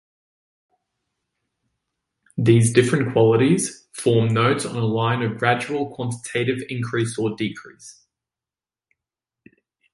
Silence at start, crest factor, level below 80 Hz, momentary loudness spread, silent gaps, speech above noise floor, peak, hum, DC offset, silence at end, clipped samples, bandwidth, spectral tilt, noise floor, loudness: 2.35 s; 22 dB; -58 dBFS; 11 LU; none; over 70 dB; -2 dBFS; none; under 0.1%; 2 s; under 0.1%; 11.5 kHz; -5.5 dB/octave; under -90 dBFS; -21 LUFS